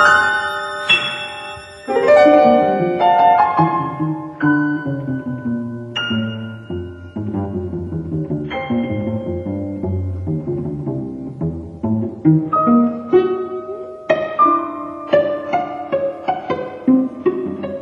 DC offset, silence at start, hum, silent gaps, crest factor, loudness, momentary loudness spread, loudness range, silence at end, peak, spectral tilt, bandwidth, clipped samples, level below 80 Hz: under 0.1%; 0 s; none; none; 18 dB; -18 LUFS; 13 LU; 10 LU; 0 s; 0 dBFS; -6.5 dB/octave; 11.5 kHz; under 0.1%; -42 dBFS